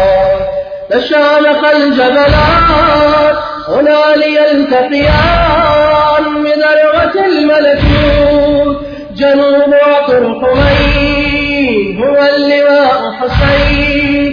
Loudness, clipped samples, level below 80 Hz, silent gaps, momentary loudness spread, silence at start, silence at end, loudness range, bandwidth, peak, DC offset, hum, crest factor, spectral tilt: -9 LUFS; under 0.1%; -22 dBFS; none; 5 LU; 0 s; 0 s; 1 LU; 5.4 kHz; 0 dBFS; under 0.1%; none; 8 dB; -7.5 dB/octave